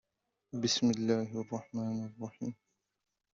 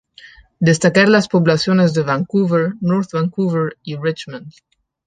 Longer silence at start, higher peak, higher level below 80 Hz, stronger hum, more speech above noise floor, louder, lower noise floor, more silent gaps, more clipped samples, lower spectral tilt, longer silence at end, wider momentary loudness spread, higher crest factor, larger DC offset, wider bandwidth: about the same, 0.55 s vs 0.6 s; second, -16 dBFS vs -2 dBFS; second, -74 dBFS vs -56 dBFS; neither; first, 44 dB vs 28 dB; second, -35 LUFS vs -16 LUFS; first, -78 dBFS vs -44 dBFS; neither; neither; about the same, -5 dB/octave vs -6 dB/octave; first, 0.85 s vs 0.55 s; first, 14 LU vs 11 LU; about the same, 20 dB vs 16 dB; neither; second, 7.6 kHz vs 9.4 kHz